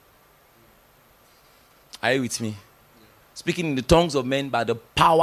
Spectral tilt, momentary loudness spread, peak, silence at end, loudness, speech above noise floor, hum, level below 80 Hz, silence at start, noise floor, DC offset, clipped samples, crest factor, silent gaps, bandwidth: -4.5 dB/octave; 16 LU; -4 dBFS; 0 s; -23 LUFS; 35 dB; none; -44 dBFS; 1.95 s; -56 dBFS; under 0.1%; under 0.1%; 22 dB; none; 16 kHz